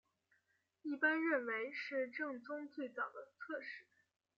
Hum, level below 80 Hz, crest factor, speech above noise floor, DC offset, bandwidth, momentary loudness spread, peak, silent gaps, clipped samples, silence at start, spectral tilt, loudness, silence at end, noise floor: none; under -90 dBFS; 20 dB; 40 dB; under 0.1%; 6.8 kHz; 15 LU; -24 dBFS; none; under 0.1%; 0.85 s; -0.5 dB/octave; -41 LUFS; 0.55 s; -81 dBFS